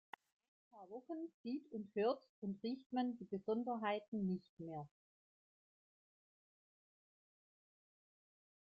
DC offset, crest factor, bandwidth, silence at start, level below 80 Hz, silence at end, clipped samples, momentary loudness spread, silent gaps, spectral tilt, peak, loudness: under 0.1%; 20 dB; 5.2 kHz; 0.75 s; -86 dBFS; 3.95 s; under 0.1%; 15 LU; 1.34-1.44 s, 2.29-2.42 s, 2.86-2.90 s, 4.08-4.12 s, 4.49-4.57 s; -5.5 dB/octave; -28 dBFS; -44 LUFS